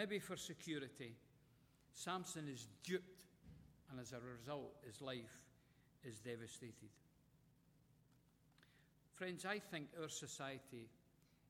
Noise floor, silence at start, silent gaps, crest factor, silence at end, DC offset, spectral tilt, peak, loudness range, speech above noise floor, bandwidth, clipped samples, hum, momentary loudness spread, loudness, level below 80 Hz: -75 dBFS; 0 s; none; 22 dB; 0 s; under 0.1%; -4 dB/octave; -30 dBFS; 8 LU; 24 dB; 16.5 kHz; under 0.1%; none; 18 LU; -51 LUFS; -80 dBFS